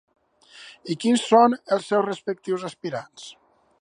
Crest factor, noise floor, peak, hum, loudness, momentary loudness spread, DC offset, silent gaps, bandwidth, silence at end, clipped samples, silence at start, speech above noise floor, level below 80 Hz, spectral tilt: 22 dB; -50 dBFS; -2 dBFS; none; -23 LUFS; 24 LU; under 0.1%; none; 10.5 kHz; 0.5 s; under 0.1%; 0.55 s; 27 dB; -74 dBFS; -5 dB/octave